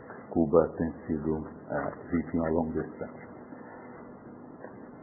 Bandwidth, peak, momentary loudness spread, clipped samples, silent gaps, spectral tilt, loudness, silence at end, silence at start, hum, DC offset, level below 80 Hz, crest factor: 2.2 kHz; -8 dBFS; 21 LU; under 0.1%; none; -14 dB/octave; -31 LUFS; 0 s; 0 s; none; under 0.1%; -52 dBFS; 24 dB